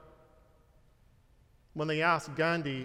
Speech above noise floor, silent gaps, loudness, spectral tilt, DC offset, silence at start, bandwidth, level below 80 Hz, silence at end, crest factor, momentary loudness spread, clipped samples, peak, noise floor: 33 dB; none; -30 LUFS; -5.5 dB/octave; under 0.1%; 1.75 s; 13.5 kHz; -64 dBFS; 0 s; 22 dB; 10 LU; under 0.1%; -14 dBFS; -64 dBFS